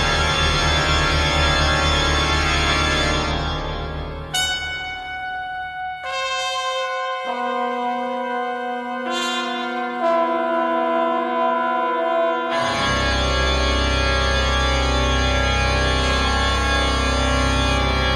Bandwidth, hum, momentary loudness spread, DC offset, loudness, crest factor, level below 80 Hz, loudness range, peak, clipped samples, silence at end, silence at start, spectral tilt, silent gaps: 12.5 kHz; none; 9 LU; under 0.1%; -20 LUFS; 16 dB; -26 dBFS; 6 LU; -4 dBFS; under 0.1%; 0 s; 0 s; -4 dB/octave; none